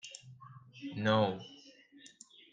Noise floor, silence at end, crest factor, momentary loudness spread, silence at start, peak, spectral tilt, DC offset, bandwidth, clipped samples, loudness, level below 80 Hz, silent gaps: -60 dBFS; 0.45 s; 22 dB; 26 LU; 0.05 s; -16 dBFS; -5.5 dB/octave; under 0.1%; 9.4 kHz; under 0.1%; -33 LUFS; -80 dBFS; none